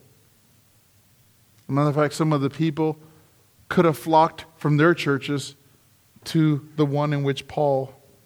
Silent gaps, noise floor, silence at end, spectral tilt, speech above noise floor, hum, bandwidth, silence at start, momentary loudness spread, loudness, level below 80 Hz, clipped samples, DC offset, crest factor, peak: none; -58 dBFS; 0.35 s; -7 dB/octave; 37 dB; none; 18.5 kHz; 1.7 s; 10 LU; -22 LUFS; -64 dBFS; under 0.1%; under 0.1%; 20 dB; -4 dBFS